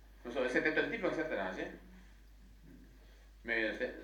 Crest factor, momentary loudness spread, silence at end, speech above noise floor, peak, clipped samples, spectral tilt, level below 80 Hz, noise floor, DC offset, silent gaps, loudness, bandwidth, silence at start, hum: 22 dB; 13 LU; 0 s; 22 dB; -16 dBFS; under 0.1%; -5 dB/octave; -58 dBFS; -58 dBFS; under 0.1%; none; -36 LUFS; 18.5 kHz; 0 s; none